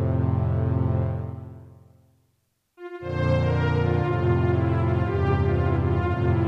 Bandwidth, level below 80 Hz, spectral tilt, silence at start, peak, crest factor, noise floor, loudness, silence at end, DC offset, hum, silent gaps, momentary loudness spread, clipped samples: 6 kHz; -38 dBFS; -9.5 dB/octave; 0 s; -10 dBFS; 14 dB; -71 dBFS; -24 LUFS; 0 s; under 0.1%; none; none; 13 LU; under 0.1%